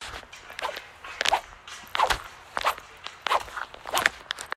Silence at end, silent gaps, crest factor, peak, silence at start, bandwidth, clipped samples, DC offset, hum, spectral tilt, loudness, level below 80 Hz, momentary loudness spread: 0.05 s; none; 30 dB; 0 dBFS; 0 s; 16 kHz; under 0.1%; under 0.1%; none; -0.5 dB/octave; -28 LUFS; -52 dBFS; 16 LU